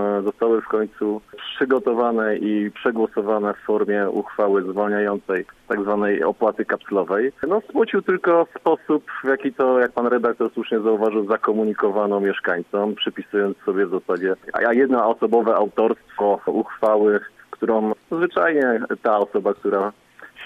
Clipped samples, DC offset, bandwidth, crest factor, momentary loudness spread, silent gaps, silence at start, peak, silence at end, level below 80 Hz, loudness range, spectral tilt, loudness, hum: under 0.1%; under 0.1%; 4.8 kHz; 16 dB; 6 LU; none; 0 s; -6 dBFS; 0 s; -64 dBFS; 2 LU; -7.5 dB/octave; -21 LUFS; none